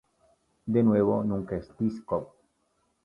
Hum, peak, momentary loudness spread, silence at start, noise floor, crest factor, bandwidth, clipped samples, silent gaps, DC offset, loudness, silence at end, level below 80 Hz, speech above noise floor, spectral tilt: none; -12 dBFS; 11 LU; 0.65 s; -73 dBFS; 18 dB; 5.4 kHz; under 0.1%; none; under 0.1%; -27 LUFS; 0.75 s; -56 dBFS; 47 dB; -10.5 dB/octave